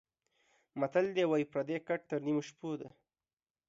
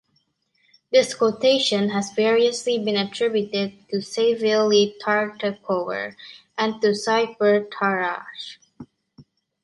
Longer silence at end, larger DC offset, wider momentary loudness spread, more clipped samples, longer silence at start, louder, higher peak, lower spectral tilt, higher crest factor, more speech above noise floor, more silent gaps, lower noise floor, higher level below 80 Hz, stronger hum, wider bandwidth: first, 0.8 s vs 0.45 s; neither; about the same, 12 LU vs 11 LU; neither; second, 0.75 s vs 0.9 s; second, -35 LUFS vs -21 LUFS; second, -20 dBFS vs -4 dBFS; first, -6.5 dB/octave vs -4 dB/octave; about the same, 18 dB vs 18 dB; first, over 56 dB vs 47 dB; neither; first, under -90 dBFS vs -69 dBFS; second, -82 dBFS vs -70 dBFS; neither; second, 7.8 kHz vs 11.5 kHz